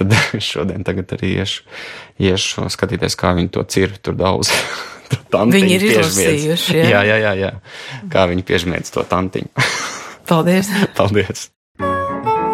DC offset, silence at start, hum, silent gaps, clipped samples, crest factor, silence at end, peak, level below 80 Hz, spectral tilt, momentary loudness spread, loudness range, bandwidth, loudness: under 0.1%; 0 s; none; 11.56-11.75 s; under 0.1%; 16 dB; 0 s; 0 dBFS; -44 dBFS; -4.5 dB/octave; 12 LU; 5 LU; 16.5 kHz; -16 LUFS